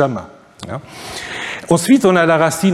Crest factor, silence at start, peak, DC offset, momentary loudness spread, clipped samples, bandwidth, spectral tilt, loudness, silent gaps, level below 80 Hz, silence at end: 16 dB; 0 s; 0 dBFS; under 0.1%; 18 LU; under 0.1%; 15.5 kHz; -5 dB/octave; -14 LUFS; none; -50 dBFS; 0 s